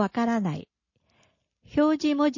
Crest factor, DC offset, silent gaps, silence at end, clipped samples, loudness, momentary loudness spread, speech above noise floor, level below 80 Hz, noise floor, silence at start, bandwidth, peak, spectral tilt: 16 dB; under 0.1%; none; 0 s; under 0.1%; -25 LUFS; 9 LU; 45 dB; -60 dBFS; -69 dBFS; 0 s; 7.4 kHz; -12 dBFS; -6.5 dB/octave